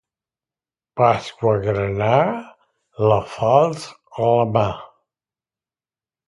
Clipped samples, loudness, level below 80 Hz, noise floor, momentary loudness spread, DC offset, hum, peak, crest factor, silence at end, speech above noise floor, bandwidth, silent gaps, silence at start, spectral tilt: under 0.1%; -19 LUFS; -50 dBFS; under -90 dBFS; 15 LU; under 0.1%; none; 0 dBFS; 20 dB; 1.45 s; over 72 dB; 11.5 kHz; none; 0.95 s; -7 dB/octave